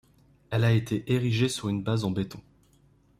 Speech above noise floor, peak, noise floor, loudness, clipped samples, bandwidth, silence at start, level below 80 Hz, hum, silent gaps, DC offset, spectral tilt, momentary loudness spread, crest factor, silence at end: 35 dB; -12 dBFS; -62 dBFS; -27 LUFS; under 0.1%; 14 kHz; 0.5 s; -56 dBFS; none; none; under 0.1%; -6 dB/octave; 9 LU; 16 dB; 0.8 s